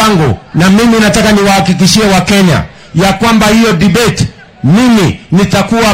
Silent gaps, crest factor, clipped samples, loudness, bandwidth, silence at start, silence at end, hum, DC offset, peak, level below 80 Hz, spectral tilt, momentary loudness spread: none; 8 dB; 0.8%; -8 LUFS; 16.5 kHz; 0 s; 0 s; none; under 0.1%; 0 dBFS; -28 dBFS; -5 dB/octave; 6 LU